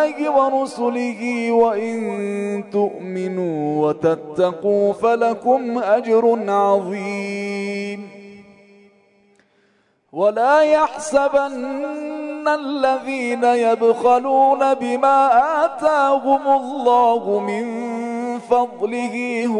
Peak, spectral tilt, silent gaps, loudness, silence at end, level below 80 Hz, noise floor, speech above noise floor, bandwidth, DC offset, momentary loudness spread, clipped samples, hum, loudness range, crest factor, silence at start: -4 dBFS; -5.5 dB/octave; none; -18 LUFS; 0 s; -64 dBFS; -61 dBFS; 43 dB; 11 kHz; under 0.1%; 10 LU; under 0.1%; none; 5 LU; 14 dB; 0 s